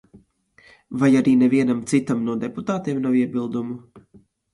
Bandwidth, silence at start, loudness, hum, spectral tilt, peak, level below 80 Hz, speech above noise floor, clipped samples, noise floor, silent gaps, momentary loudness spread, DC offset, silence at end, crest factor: 11.5 kHz; 0.15 s; -21 LUFS; none; -7 dB/octave; -6 dBFS; -62 dBFS; 36 dB; under 0.1%; -56 dBFS; none; 12 LU; under 0.1%; 0.55 s; 16 dB